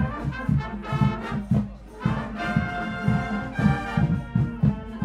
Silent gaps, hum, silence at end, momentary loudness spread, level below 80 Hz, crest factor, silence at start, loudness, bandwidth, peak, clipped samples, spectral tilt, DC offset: none; none; 0 s; 5 LU; -38 dBFS; 18 dB; 0 s; -26 LUFS; 9.8 kHz; -6 dBFS; under 0.1%; -8 dB/octave; under 0.1%